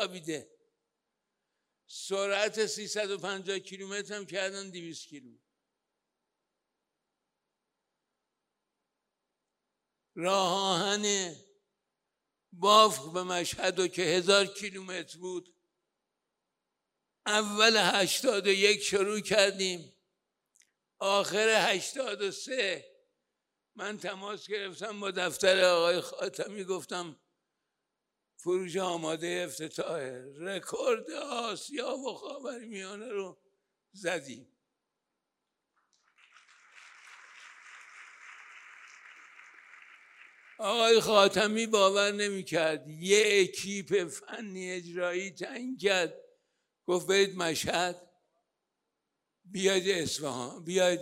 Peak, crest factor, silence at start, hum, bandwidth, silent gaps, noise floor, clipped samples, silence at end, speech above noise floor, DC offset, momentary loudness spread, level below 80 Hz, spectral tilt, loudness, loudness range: -6 dBFS; 26 dB; 0 s; none; 16 kHz; none; -86 dBFS; under 0.1%; 0 s; 56 dB; under 0.1%; 18 LU; -76 dBFS; -2.5 dB/octave; -29 LUFS; 15 LU